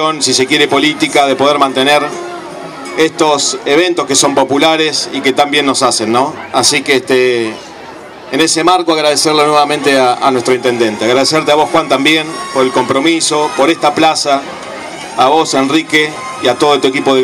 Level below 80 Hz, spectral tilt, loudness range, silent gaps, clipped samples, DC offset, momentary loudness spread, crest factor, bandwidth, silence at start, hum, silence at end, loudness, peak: -54 dBFS; -2.5 dB/octave; 2 LU; none; 0.2%; under 0.1%; 10 LU; 12 dB; 16 kHz; 0 s; none; 0 s; -10 LUFS; 0 dBFS